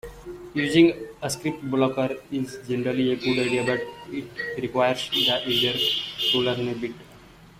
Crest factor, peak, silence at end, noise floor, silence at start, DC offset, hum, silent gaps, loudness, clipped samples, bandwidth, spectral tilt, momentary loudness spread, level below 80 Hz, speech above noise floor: 20 dB; -6 dBFS; 0.15 s; -49 dBFS; 0.05 s; under 0.1%; none; none; -24 LUFS; under 0.1%; 15.5 kHz; -4.5 dB/octave; 12 LU; -56 dBFS; 24 dB